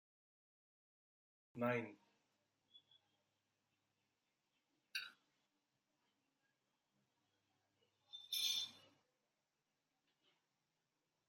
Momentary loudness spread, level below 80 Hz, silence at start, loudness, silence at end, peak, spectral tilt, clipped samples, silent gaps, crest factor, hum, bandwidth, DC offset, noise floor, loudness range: 18 LU; under -90 dBFS; 1.55 s; -43 LUFS; 2.5 s; -28 dBFS; -2.5 dB/octave; under 0.1%; none; 24 dB; none; 13.5 kHz; under 0.1%; -90 dBFS; 10 LU